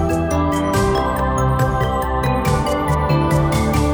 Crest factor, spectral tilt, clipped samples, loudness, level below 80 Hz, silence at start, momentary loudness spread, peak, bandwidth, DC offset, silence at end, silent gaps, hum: 12 dB; -6.5 dB/octave; under 0.1%; -18 LUFS; -26 dBFS; 0 s; 2 LU; -4 dBFS; over 20 kHz; under 0.1%; 0 s; none; none